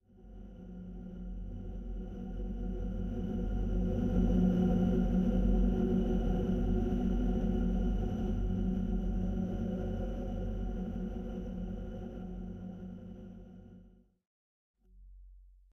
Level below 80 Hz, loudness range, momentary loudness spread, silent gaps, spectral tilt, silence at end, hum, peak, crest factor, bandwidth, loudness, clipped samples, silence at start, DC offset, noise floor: -38 dBFS; 14 LU; 16 LU; 14.27-14.74 s; -9.5 dB/octave; 0.25 s; none; -18 dBFS; 16 dB; 6.2 kHz; -35 LUFS; under 0.1%; 0.2 s; under 0.1%; -60 dBFS